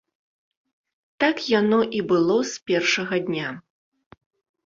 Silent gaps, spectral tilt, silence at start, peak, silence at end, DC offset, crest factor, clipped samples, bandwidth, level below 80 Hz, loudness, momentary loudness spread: 2.62-2.66 s; -4.5 dB/octave; 1.2 s; -6 dBFS; 1.05 s; under 0.1%; 18 dB; under 0.1%; 7.6 kHz; -66 dBFS; -22 LUFS; 9 LU